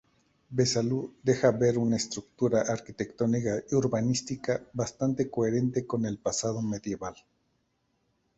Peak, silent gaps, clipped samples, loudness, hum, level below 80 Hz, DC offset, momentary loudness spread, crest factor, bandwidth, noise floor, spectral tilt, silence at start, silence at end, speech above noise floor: -8 dBFS; none; under 0.1%; -29 LUFS; none; -60 dBFS; under 0.1%; 9 LU; 20 dB; 8.2 kHz; -75 dBFS; -5.5 dB/octave; 0.5 s; 1.25 s; 46 dB